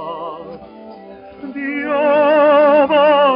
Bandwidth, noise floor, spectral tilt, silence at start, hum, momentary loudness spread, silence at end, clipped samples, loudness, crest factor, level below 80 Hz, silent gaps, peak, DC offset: 5.2 kHz; -36 dBFS; -2 dB/octave; 0 s; none; 22 LU; 0 s; under 0.1%; -13 LUFS; 12 dB; -58 dBFS; none; -4 dBFS; under 0.1%